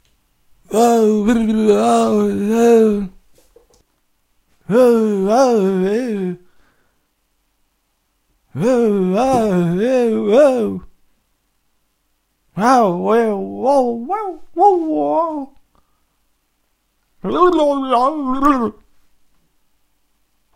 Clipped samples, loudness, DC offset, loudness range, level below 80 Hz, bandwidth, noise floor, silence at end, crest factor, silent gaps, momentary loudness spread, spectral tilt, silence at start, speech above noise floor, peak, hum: under 0.1%; -15 LUFS; under 0.1%; 5 LU; -46 dBFS; 16 kHz; -66 dBFS; 1.85 s; 16 dB; none; 11 LU; -6.5 dB/octave; 0.7 s; 52 dB; 0 dBFS; none